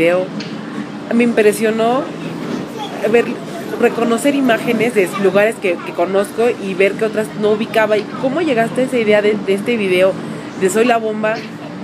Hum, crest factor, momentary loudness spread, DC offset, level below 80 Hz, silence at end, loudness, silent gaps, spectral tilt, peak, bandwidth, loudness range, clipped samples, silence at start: none; 16 dB; 11 LU; under 0.1%; -60 dBFS; 0 s; -16 LUFS; none; -5 dB/octave; 0 dBFS; 15.5 kHz; 2 LU; under 0.1%; 0 s